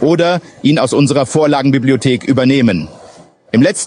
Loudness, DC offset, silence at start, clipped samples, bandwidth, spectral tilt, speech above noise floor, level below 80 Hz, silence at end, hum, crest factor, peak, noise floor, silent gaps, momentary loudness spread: -12 LUFS; under 0.1%; 0 s; under 0.1%; 10.5 kHz; -5.5 dB/octave; 29 dB; -50 dBFS; 0 s; none; 12 dB; 0 dBFS; -40 dBFS; none; 4 LU